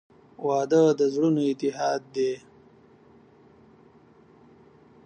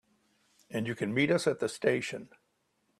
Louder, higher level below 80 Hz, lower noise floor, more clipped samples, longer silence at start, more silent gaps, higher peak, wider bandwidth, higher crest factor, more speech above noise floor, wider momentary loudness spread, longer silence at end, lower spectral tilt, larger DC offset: first, -24 LUFS vs -31 LUFS; about the same, -72 dBFS vs -72 dBFS; second, -55 dBFS vs -76 dBFS; neither; second, 0.4 s vs 0.7 s; neither; first, -10 dBFS vs -14 dBFS; second, 9.2 kHz vs 13.5 kHz; about the same, 18 dB vs 20 dB; second, 32 dB vs 45 dB; second, 9 LU vs 12 LU; first, 2.7 s vs 0.75 s; first, -6.5 dB/octave vs -5 dB/octave; neither